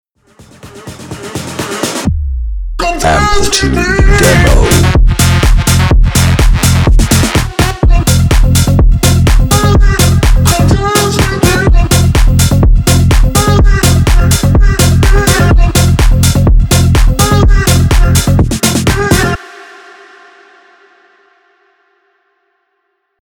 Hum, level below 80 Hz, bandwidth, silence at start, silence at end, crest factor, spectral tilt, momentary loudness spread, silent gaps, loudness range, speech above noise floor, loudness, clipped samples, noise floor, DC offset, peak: none; -12 dBFS; 20 kHz; 0.65 s; 3.55 s; 8 dB; -5 dB/octave; 7 LU; none; 5 LU; 57 dB; -9 LUFS; 0.5%; -64 dBFS; under 0.1%; 0 dBFS